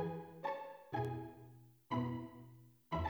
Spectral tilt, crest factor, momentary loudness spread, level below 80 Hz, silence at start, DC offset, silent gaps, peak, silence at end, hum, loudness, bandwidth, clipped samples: -8 dB/octave; 16 dB; 19 LU; -62 dBFS; 0 s; under 0.1%; none; -26 dBFS; 0 s; none; -44 LUFS; over 20 kHz; under 0.1%